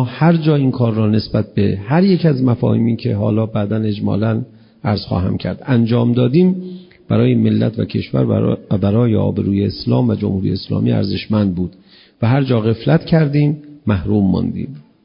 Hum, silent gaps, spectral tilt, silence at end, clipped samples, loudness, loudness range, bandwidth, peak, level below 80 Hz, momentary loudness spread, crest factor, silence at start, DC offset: none; none; -13 dB/octave; 0.25 s; under 0.1%; -16 LUFS; 2 LU; 5.4 kHz; -2 dBFS; -38 dBFS; 7 LU; 12 dB; 0 s; under 0.1%